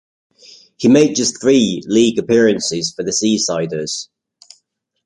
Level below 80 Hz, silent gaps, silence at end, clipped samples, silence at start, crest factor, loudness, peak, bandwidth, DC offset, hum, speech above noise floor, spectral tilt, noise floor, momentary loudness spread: -56 dBFS; none; 1 s; under 0.1%; 0.8 s; 16 dB; -15 LUFS; -2 dBFS; 11 kHz; under 0.1%; none; 50 dB; -4 dB/octave; -65 dBFS; 10 LU